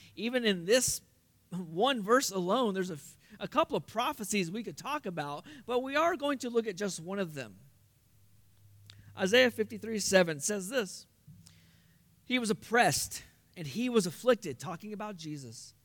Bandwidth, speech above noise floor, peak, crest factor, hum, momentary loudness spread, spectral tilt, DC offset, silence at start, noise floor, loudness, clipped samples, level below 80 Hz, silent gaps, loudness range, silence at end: 18 kHz; 33 dB; -10 dBFS; 22 dB; none; 16 LU; -3.5 dB/octave; under 0.1%; 0.05 s; -65 dBFS; -31 LUFS; under 0.1%; -68 dBFS; none; 4 LU; 0.15 s